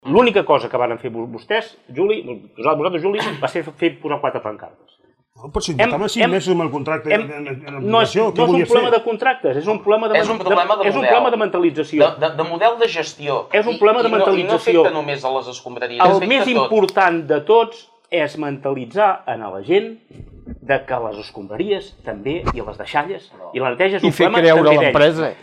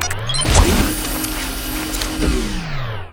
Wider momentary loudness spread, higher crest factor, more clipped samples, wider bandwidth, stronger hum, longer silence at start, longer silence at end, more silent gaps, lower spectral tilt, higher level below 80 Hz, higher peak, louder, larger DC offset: about the same, 13 LU vs 11 LU; about the same, 16 dB vs 18 dB; neither; second, 13 kHz vs 19.5 kHz; neither; about the same, 0.05 s vs 0 s; about the same, 0.1 s vs 0 s; neither; first, -5.5 dB/octave vs -3.5 dB/octave; second, -46 dBFS vs -22 dBFS; about the same, -2 dBFS vs 0 dBFS; about the same, -17 LUFS vs -19 LUFS; neither